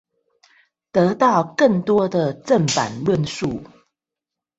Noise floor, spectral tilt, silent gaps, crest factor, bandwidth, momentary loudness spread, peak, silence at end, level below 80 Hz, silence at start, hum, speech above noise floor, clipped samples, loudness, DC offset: -86 dBFS; -5.5 dB/octave; none; 18 dB; 8.2 kHz; 8 LU; -2 dBFS; 0.9 s; -54 dBFS; 0.95 s; none; 68 dB; under 0.1%; -19 LUFS; under 0.1%